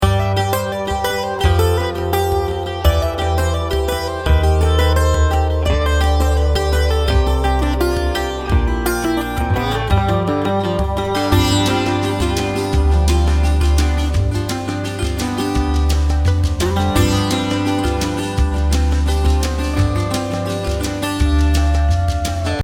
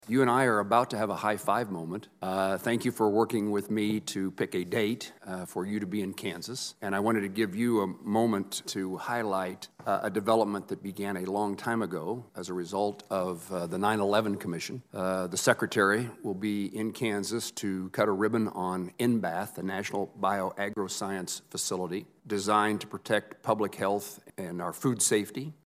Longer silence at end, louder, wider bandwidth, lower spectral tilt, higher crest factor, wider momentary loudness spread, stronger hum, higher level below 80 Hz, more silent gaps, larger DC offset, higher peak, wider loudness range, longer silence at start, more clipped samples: second, 0 s vs 0.15 s; first, -17 LUFS vs -30 LUFS; about the same, 16.5 kHz vs 15.5 kHz; about the same, -5.5 dB/octave vs -4.5 dB/octave; second, 14 dB vs 24 dB; second, 5 LU vs 10 LU; neither; first, -20 dBFS vs -78 dBFS; neither; neither; first, -2 dBFS vs -6 dBFS; about the same, 2 LU vs 3 LU; about the same, 0 s vs 0.05 s; neither